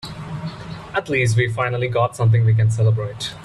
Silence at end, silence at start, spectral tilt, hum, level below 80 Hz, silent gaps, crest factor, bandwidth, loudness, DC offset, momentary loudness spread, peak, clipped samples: 0 s; 0.05 s; -6 dB/octave; none; -48 dBFS; none; 12 dB; 11.5 kHz; -19 LUFS; under 0.1%; 14 LU; -6 dBFS; under 0.1%